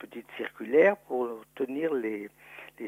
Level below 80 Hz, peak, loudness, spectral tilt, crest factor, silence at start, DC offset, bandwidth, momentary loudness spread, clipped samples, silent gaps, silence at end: -76 dBFS; -10 dBFS; -29 LUFS; -6.5 dB/octave; 20 dB; 0 s; under 0.1%; 15.5 kHz; 21 LU; under 0.1%; none; 0 s